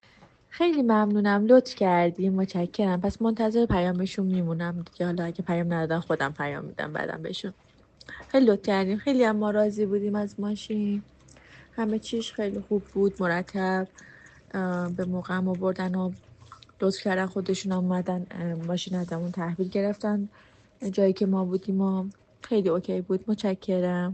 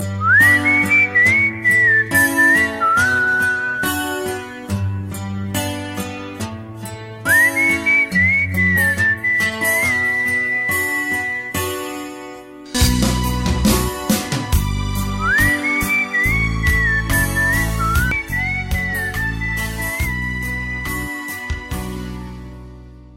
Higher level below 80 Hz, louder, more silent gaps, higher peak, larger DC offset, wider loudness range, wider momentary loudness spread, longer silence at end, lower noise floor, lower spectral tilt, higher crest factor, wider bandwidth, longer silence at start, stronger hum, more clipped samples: second, -56 dBFS vs -30 dBFS; second, -27 LUFS vs -16 LUFS; neither; about the same, -6 dBFS vs -4 dBFS; neither; second, 6 LU vs 9 LU; second, 10 LU vs 15 LU; about the same, 0 s vs 0 s; first, -56 dBFS vs -38 dBFS; first, -7 dB/octave vs -4 dB/octave; about the same, 20 dB vs 16 dB; second, 8.6 kHz vs 16.5 kHz; first, 0.5 s vs 0 s; neither; neither